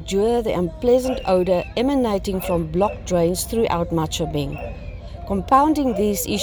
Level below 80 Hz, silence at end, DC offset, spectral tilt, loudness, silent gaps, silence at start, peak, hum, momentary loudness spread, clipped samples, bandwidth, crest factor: -36 dBFS; 0 s; under 0.1%; -5.5 dB/octave; -20 LUFS; none; 0 s; -4 dBFS; none; 9 LU; under 0.1%; over 20 kHz; 16 dB